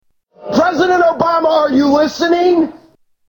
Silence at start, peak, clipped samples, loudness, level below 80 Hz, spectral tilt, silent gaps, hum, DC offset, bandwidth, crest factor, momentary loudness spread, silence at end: 0.4 s; 0 dBFS; under 0.1%; -13 LUFS; -50 dBFS; -5 dB/octave; none; none; under 0.1%; 18 kHz; 14 dB; 5 LU; 0.55 s